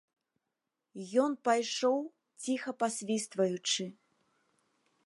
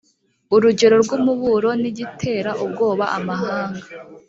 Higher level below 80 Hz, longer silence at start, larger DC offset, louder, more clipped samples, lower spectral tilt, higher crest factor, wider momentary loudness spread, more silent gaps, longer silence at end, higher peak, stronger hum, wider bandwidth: second, -88 dBFS vs -58 dBFS; first, 0.95 s vs 0.5 s; neither; second, -32 LUFS vs -19 LUFS; neither; second, -3.5 dB/octave vs -5.5 dB/octave; about the same, 20 dB vs 16 dB; about the same, 14 LU vs 12 LU; neither; first, 1.15 s vs 0.1 s; second, -14 dBFS vs -2 dBFS; neither; first, 11.5 kHz vs 7.8 kHz